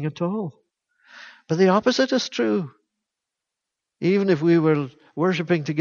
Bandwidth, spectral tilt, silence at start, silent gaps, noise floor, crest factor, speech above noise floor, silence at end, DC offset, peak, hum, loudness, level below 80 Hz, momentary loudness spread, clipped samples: 7.2 kHz; -6 dB/octave; 0 s; none; -85 dBFS; 18 dB; 64 dB; 0 s; under 0.1%; -6 dBFS; none; -21 LUFS; -68 dBFS; 11 LU; under 0.1%